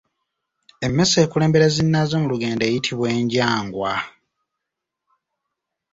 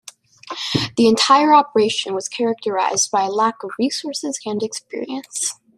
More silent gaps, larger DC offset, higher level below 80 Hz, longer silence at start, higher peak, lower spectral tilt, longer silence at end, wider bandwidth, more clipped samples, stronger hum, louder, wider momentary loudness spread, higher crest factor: neither; neither; first, -52 dBFS vs -62 dBFS; first, 0.8 s vs 0.45 s; about the same, -2 dBFS vs -2 dBFS; first, -5 dB/octave vs -3 dB/octave; first, 1.85 s vs 0.25 s; second, 8 kHz vs 14 kHz; neither; neither; about the same, -19 LUFS vs -18 LUFS; second, 8 LU vs 14 LU; about the same, 18 dB vs 18 dB